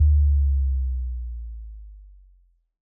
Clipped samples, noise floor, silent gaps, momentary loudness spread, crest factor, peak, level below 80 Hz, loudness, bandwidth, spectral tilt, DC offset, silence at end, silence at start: under 0.1%; -58 dBFS; none; 22 LU; 12 dB; -10 dBFS; -24 dBFS; -24 LUFS; 0.2 kHz; -27.5 dB/octave; under 0.1%; 0.9 s; 0 s